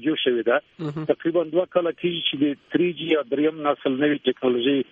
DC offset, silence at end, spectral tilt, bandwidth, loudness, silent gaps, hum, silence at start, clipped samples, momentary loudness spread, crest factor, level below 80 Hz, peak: under 0.1%; 0.1 s; -8 dB/octave; 4.4 kHz; -23 LUFS; none; none; 0 s; under 0.1%; 3 LU; 16 dB; -68 dBFS; -6 dBFS